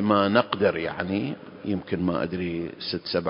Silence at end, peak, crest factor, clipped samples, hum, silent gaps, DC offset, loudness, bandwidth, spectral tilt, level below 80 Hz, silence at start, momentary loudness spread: 0 s; -4 dBFS; 22 dB; under 0.1%; none; none; under 0.1%; -26 LUFS; 5.4 kHz; -10.5 dB/octave; -52 dBFS; 0 s; 10 LU